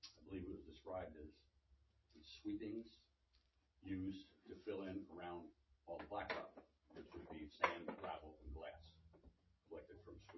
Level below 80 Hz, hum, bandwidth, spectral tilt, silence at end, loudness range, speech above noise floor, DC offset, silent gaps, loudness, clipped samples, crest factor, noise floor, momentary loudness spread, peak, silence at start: -68 dBFS; none; 6 kHz; -4 dB/octave; 0 s; 5 LU; 29 dB; under 0.1%; none; -51 LUFS; under 0.1%; 32 dB; -80 dBFS; 16 LU; -20 dBFS; 0.05 s